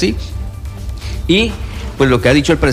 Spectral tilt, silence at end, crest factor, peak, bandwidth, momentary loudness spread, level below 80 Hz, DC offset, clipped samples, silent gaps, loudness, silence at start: -5.5 dB/octave; 0 s; 12 dB; -2 dBFS; 15.5 kHz; 15 LU; -24 dBFS; under 0.1%; under 0.1%; none; -14 LUFS; 0 s